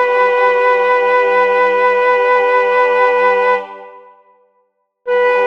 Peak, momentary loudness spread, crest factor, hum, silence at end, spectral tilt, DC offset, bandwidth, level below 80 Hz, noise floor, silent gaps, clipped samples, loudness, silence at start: -2 dBFS; 4 LU; 10 dB; none; 0 s; -3.5 dB/octave; 0.2%; 6.8 kHz; -74 dBFS; -62 dBFS; none; under 0.1%; -12 LUFS; 0 s